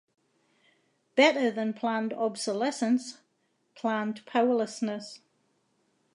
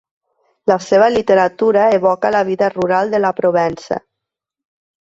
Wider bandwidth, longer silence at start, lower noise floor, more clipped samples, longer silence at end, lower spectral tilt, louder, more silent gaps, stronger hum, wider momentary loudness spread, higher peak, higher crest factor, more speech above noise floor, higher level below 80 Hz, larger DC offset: first, 11 kHz vs 8 kHz; first, 1.15 s vs 0.65 s; second, -74 dBFS vs -82 dBFS; neither; about the same, 0.95 s vs 1.05 s; second, -4 dB/octave vs -6 dB/octave; second, -28 LUFS vs -15 LUFS; neither; neither; first, 11 LU vs 8 LU; second, -8 dBFS vs 0 dBFS; first, 22 dB vs 14 dB; second, 46 dB vs 68 dB; second, -86 dBFS vs -56 dBFS; neither